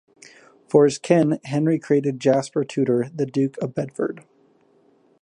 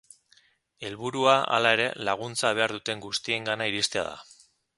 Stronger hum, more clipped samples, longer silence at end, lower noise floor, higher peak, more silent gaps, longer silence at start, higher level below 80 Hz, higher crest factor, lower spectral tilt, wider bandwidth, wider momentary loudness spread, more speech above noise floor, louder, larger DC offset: neither; neither; first, 1 s vs 0.55 s; second, -59 dBFS vs -63 dBFS; about the same, -2 dBFS vs -4 dBFS; neither; about the same, 0.75 s vs 0.8 s; about the same, -68 dBFS vs -66 dBFS; about the same, 20 dB vs 24 dB; first, -7 dB/octave vs -2.5 dB/octave; about the same, 11 kHz vs 11.5 kHz; second, 10 LU vs 13 LU; about the same, 38 dB vs 37 dB; first, -21 LUFS vs -26 LUFS; neither